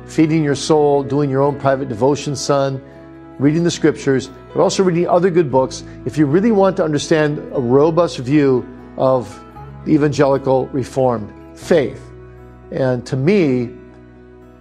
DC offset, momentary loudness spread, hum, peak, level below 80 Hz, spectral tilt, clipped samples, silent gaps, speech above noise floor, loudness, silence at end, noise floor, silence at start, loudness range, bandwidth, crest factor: under 0.1%; 11 LU; none; 0 dBFS; -46 dBFS; -6.5 dB/octave; under 0.1%; none; 26 dB; -16 LUFS; 0.8 s; -41 dBFS; 0 s; 3 LU; 12 kHz; 16 dB